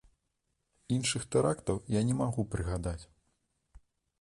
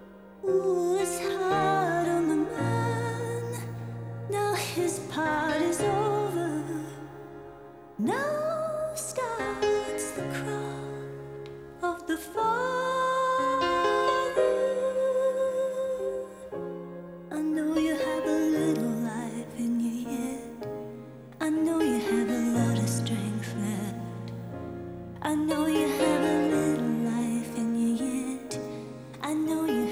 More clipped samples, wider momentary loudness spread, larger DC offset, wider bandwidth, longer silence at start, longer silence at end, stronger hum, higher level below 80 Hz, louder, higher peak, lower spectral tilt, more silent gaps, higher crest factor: neither; second, 7 LU vs 13 LU; neither; second, 11.5 kHz vs 16.5 kHz; first, 0.9 s vs 0 s; first, 1.15 s vs 0 s; neither; first, -50 dBFS vs -60 dBFS; second, -32 LUFS vs -29 LUFS; second, -16 dBFS vs -12 dBFS; about the same, -5.5 dB/octave vs -5.5 dB/octave; neither; about the same, 18 dB vs 16 dB